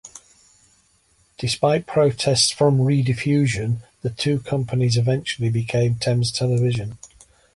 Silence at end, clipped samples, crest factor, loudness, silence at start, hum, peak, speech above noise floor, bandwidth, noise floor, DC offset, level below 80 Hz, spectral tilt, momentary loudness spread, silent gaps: 0.5 s; under 0.1%; 16 dB; -20 LUFS; 0.05 s; none; -4 dBFS; 41 dB; 11.5 kHz; -61 dBFS; under 0.1%; -50 dBFS; -5.5 dB/octave; 9 LU; none